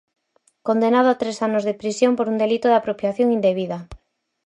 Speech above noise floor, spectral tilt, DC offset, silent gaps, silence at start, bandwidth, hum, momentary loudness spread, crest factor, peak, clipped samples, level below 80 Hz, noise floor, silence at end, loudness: 40 dB; -5.5 dB/octave; under 0.1%; none; 0.65 s; 10.5 kHz; none; 8 LU; 16 dB; -4 dBFS; under 0.1%; -54 dBFS; -59 dBFS; 0.5 s; -20 LUFS